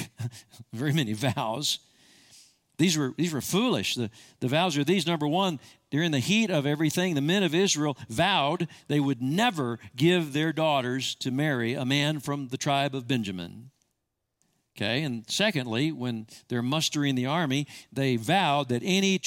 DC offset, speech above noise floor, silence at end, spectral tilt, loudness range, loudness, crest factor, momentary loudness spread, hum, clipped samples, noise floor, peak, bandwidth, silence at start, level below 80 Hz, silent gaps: under 0.1%; 54 dB; 0 s; -4.5 dB/octave; 5 LU; -27 LUFS; 18 dB; 9 LU; none; under 0.1%; -81 dBFS; -10 dBFS; 17 kHz; 0 s; -68 dBFS; none